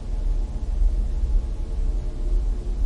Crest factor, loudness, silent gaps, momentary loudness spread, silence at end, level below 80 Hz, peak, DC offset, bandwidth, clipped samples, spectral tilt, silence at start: 12 dB; -28 LUFS; none; 4 LU; 0 s; -22 dBFS; -10 dBFS; 0.4%; 5.2 kHz; under 0.1%; -8 dB/octave; 0 s